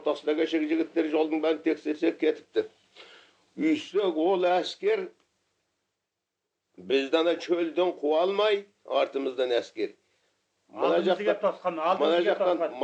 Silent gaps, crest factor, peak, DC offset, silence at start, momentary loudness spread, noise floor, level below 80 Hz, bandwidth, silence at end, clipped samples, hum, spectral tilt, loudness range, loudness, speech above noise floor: none; 18 dB; -10 dBFS; under 0.1%; 0 s; 7 LU; -84 dBFS; under -90 dBFS; 8.4 kHz; 0 s; under 0.1%; 50 Hz at -85 dBFS; -5 dB/octave; 3 LU; -27 LUFS; 58 dB